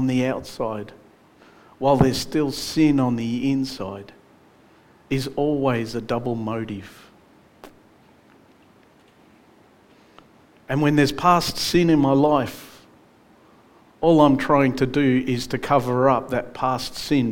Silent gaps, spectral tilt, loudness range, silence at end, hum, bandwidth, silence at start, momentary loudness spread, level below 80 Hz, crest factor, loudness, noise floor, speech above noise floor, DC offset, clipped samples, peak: none; -6 dB/octave; 9 LU; 0 s; none; 17 kHz; 0 s; 11 LU; -48 dBFS; 22 dB; -21 LUFS; -54 dBFS; 34 dB; under 0.1%; under 0.1%; -2 dBFS